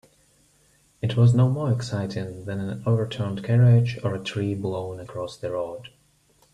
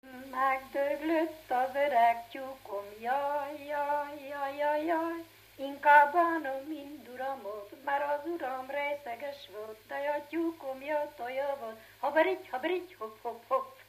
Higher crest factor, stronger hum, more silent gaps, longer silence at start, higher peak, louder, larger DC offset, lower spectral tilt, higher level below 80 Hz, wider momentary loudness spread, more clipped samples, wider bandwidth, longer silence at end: second, 16 dB vs 22 dB; second, none vs 50 Hz at -75 dBFS; neither; first, 1.05 s vs 0.05 s; about the same, -8 dBFS vs -10 dBFS; first, -24 LUFS vs -32 LUFS; neither; first, -8 dB/octave vs -4 dB/octave; first, -56 dBFS vs -74 dBFS; about the same, 14 LU vs 16 LU; neither; second, 10 kHz vs 15 kHz; first, 0.65 s vs 0.05 s